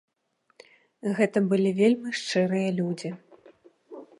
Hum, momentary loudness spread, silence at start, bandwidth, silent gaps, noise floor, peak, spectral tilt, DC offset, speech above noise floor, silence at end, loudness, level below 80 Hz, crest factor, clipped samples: none; 18 LU; 1.05 s; 11.5 kHz; none; -71 dBFS; -10 dBFS; -6 dB/octave; under 0.1%; 47 dB; 0.15 s; -25 LUFS; -78 dBFS; 18 dB; under 0.1%